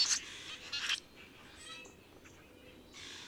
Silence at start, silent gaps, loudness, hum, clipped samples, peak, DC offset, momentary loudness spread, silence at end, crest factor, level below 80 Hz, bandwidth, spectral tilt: 0 s; none; -38 LUFS; none; under 0.1%; -18 dBFS; under 0.1%; 22 LU; 0 s; 24 dB; -70 dBFS; over 20 kHz; 1 dB/octave